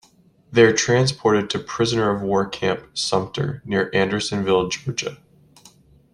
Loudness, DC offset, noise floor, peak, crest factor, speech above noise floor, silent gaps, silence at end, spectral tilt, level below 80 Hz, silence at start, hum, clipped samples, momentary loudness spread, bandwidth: -20 LUFS; under 0.1%; -55 dBFS; -2 dBFS; 20 dB; 35 dB; none; 1 s; -4.5 dB/octave; -54 dBFS; 0.5 s; none; under 0.1%; 10 LU; 11.5 kHz